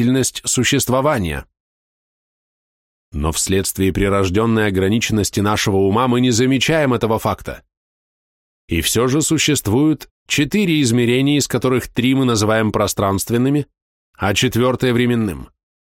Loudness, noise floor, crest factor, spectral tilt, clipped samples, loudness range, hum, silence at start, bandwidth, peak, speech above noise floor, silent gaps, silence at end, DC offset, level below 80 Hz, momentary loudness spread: -17 LUFS; under -90 dBFS; 14 dB; -4.5 dB/octave; under 0.1%; 4 LU; none; 0 s; 17 kHz; -4 dBFS; over 74 dB; 1.60-3.12 s, 7.77-8.68 s, 10.11-10.26 s, 13.82-14.13 s; 0.5 s; under 0.1%; -38 dBFS; 8 LU